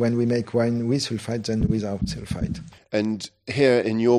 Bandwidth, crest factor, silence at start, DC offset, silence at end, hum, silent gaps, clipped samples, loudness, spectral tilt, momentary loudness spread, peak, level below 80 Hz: 13 kHz; 18 dB; 0 s; under 0.1%; 0 s; none; none; under 0.1%; -24 LUFS; -6.5 dB/octave; 10 LU; -6 dBFS; -42 dBFS